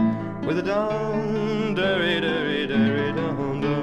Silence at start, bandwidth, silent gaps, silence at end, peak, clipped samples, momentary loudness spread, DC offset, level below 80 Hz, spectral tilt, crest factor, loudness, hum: 0 s; 8.8 kHz; none; 0 s; -10 dBFS; under 0.1%; 4 LU; under 0.1%; -50 dBFS; -7 dB/octave; 14 dB; -24 LUFS; none